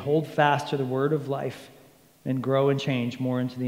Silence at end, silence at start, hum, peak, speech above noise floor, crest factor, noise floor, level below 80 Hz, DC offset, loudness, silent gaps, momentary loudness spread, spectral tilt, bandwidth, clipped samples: 0 s; 0 s; none; -6 dBFS; 29 dB; 20 dB; -54 dBFS; -72 dBFS; under 0.1%; -26 LUFS; none; 9 LU; -7 dB/octave; 16 kHz; under 0.1%